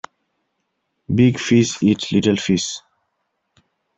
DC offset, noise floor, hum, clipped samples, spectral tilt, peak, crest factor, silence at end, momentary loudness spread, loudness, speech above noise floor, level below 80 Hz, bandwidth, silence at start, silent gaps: under 0.1%; -73 dBFS; none; under 0.1%; -5.5 dB/octave; -2 dBFS; 18 dB; 1.2 s; 8 LU; -18 LUFS; 56 dB; -56 dBFS; 8.2 kHz; 1.1 s; none